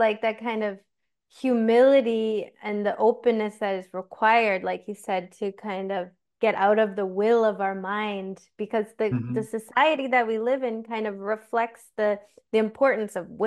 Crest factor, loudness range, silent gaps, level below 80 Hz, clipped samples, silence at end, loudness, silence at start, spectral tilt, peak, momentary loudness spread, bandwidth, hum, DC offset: 18 dB; 3 LU; none; -72 dBFS; under 0.1%; 0 s; -25 LUFS; 0 s; -6 dB/octave; -8 dBFS; 11 LU; 12.5 kHz; none; under 0.1%